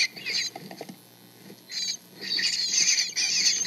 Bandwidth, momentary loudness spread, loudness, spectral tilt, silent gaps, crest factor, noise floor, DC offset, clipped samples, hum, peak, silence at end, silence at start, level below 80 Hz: 15.5 kHz; 21 LU; -24 LUFS; 1.5 dB/octave; none; 20 dB; -52 dBFS; under 0.1%; under 0.1%; none; -8 dBFS; 0 s; 0 s; -90 dBFS